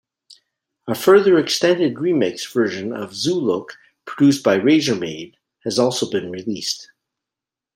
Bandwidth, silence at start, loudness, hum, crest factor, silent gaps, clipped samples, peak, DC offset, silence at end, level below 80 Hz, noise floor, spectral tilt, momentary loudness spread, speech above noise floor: 16 kHz; 0.85 s; -19 LUFS; none; 18 dB; none; under 0.1%; -2 dBFS; under 0.1%; 0.9 s; -64 dBFS; -87 dBFS; -4.5 dB/octave; 16 LU; 69 dB